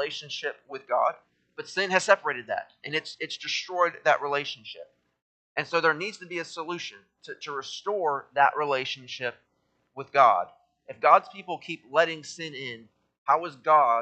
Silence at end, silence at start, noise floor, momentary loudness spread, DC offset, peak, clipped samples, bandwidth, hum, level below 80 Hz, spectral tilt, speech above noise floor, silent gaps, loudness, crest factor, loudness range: 0 s; 0 s; -73 dBFS; 18 LU; under 0.1%; -4 dBFS; under 0.1%; 9 kHz; none; -82 dBFS; -3 dB/octave; 46 dB; 5.22-5.55 s, 13.18-13.26 s; -27 LUFS; 24 dB; 5 LU